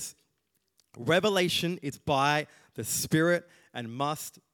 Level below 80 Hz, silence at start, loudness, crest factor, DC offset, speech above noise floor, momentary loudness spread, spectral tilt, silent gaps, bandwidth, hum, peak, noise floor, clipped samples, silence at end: -66 dBFS; 0 s; -28 LUFS; 20 dB; under 0.1%; 49 dB; 15 LU; -4 dB/octave; none; 19 kHz; none; -10 dBFS; -77 dBFS; under 0.1%; 0.25 s